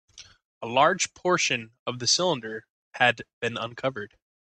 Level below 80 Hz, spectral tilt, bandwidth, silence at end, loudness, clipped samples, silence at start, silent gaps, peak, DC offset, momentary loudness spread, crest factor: -68 dBFS; -2.5 dB/octave; 10.5 kHz; 0.4 s; -25 LUFS; under 0.1%; 0.15 s; 0.45-0.61 s, 1.79-1.86 s, 2.70-2.91 s, 3.33-3.41 s; -6 dBFS; under 0.1%; 17 LU; 22 dB